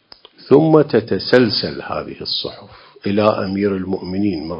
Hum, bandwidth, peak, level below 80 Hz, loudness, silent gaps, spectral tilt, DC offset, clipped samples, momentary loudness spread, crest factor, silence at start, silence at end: none; 8 kHz; 0 dBFS; -48 dBFS; -17 LUFS; none; -8 dB/octave; under 0.1%; under 0.1%; 12 LU; 18 dB; 0.45 s; 0 s